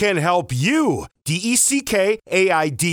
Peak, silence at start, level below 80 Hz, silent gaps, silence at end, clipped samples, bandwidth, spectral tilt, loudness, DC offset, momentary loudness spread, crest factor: -6 dBFS; 0 s; -52 dBFS; none; 0 s; under 0.1%; over 20 kHz; -3.5 dB/octave; -18 LUFS; under 0.1%; 7 LU; 12 dB